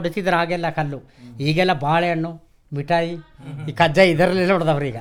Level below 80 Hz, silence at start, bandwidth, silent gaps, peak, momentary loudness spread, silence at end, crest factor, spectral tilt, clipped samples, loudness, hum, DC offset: -50 dBFS; 0 s; 16.5 kHz; none; -2 dBFS; 17 LU; 0 s; 18 dB; -6.5 dB/octave; under 0.1%; -19 LUFS; none; under 0.1%